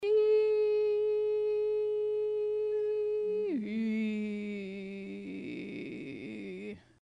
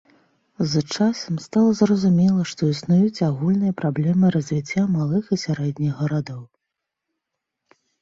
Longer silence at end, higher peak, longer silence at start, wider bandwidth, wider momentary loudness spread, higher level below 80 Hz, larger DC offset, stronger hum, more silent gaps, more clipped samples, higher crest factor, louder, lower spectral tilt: second, 0.2 s vs 1.55 s; second, -20 dBFS vs -6 dBFS; second, 0 s vs 0.6 s; second, 5.4 kHz vs 7.8 kHz; first, 15 LU vs 7 LU; second, -72 dBFS vs -58 dBFS; neither; neither; neither; neither; about the same, 12 dB vs 16 dB; second, -32 LUFS vs -21 LUFS; about the same, -7.5 dB/octave vs -7 dB/octave